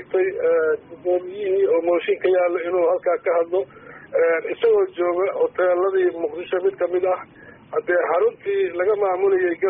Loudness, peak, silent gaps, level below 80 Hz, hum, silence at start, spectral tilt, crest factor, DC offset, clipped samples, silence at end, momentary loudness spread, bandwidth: -21 LUFS; -10 dBFS; none; -66 dBFS; none; 0 s; 0.5 dB/octave; 10 dB; under 0.1%; under 0.1%; 0 s; 5 LU; 3.8 kHz